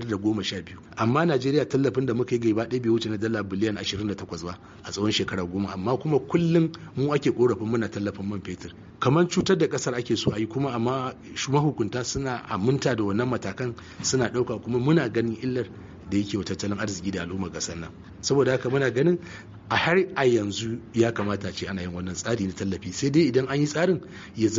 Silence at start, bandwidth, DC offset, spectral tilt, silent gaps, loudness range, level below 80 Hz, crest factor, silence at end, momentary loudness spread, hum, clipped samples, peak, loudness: 0 s; 7.6 kHz; under 0.1%; -5.5 dB/octave; none; 3 LU; -54 dBFS; 18 dB; 0 s; 10 LU; none; under 0.1%; -8 dBFS; -26 LUFS